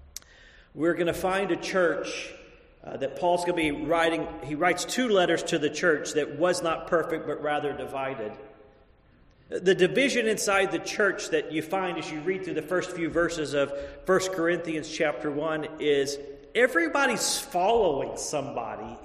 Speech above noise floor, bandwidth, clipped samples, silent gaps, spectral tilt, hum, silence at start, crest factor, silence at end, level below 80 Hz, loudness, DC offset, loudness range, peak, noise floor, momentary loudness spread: 31 dB; 13.5 kHz; under 0.1%; none; -3.5 dB/octave; none; 0.45 s; 20 dB; 0 s; -56 dBFS; -27 LUFS; under 0.1%; 3 LU; -8 dBFS; -58 dBFS; 11 LU